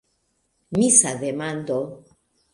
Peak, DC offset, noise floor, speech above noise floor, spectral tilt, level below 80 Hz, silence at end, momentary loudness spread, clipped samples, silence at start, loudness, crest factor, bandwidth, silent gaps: 0 dBFS; under 0.1%; -70 dBFS; 49 dB; -3.5 dB/octave; -62 dBFS; 0.55 s; 13 LU; under 0.1%; 0.7 s; -20 LUFS; 24 dB; 11.5 kHz; none